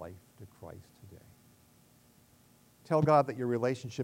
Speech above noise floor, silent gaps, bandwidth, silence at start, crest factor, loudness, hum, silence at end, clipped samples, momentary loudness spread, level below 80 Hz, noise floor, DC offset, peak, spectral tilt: 34 dB; none; 16 kHz; 0 s; 22 dB; -29 LUFS; none; 0 s; under 0.1%; 26 LU; -68 dBFS; -63 dBFS; under 0.1%; -12 dBFS; -7.5 dB/octave